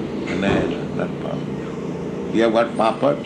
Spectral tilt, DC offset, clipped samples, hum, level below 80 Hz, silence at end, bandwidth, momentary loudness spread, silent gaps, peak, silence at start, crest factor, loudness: -7 dB/octave; under 0.1%; under 0.1%; none; -46 dBFS; 0 s; 9.6 kHz; 10 LU; none; -4 dBFS; 0 s; 18 dB; -22 LUFS